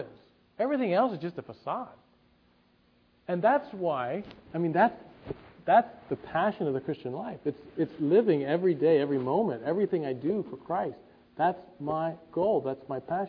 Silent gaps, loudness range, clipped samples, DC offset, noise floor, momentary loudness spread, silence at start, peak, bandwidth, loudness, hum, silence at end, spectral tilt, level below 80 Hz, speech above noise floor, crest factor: none; 5 LU; under 0.1%; under 0.1%; -65 dBFS; 14 LU; 0 s; -10 dBFS; 5.2 kHz; -29 LUFS; none; 0 s; -10 dB/octave; -68 dBFS; 37 dB; 20 dB